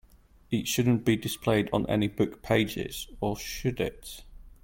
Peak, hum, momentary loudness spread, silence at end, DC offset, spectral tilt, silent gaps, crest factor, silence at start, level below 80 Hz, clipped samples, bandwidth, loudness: -10 dBFS; none; 9 LU; 0.15 s; under 0.1%; -5.5 dB/octave; none; 18 dB; 0.5 s; -48 dBFS; under 0.1%; 17 kHz; -28 LUFS